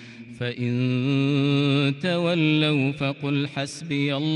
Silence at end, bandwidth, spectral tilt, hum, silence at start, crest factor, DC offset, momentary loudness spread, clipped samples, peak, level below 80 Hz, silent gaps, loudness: 0 s; 11 kHz; -6.5 dB/octave; none; 0 s; 12 dB; under 0.1%; 8 LU; under 0.1%; -10 dBFS; -66 dBFS; none; -23 LUFS